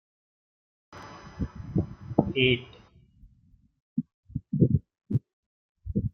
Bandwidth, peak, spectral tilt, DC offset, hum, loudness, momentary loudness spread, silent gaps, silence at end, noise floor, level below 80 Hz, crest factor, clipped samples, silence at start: 6.4 kHz; -2 dBFS; -8 dB/octave; under 0.1%; none; -29 LUFS; 21 LU; 3.82-3.96 s, 4.14-4.23 s, 5.33-5.75 s; 0.05 s; -62 dBFS; -48 dBFS; 28 dB; under 0.1%; 0.9 s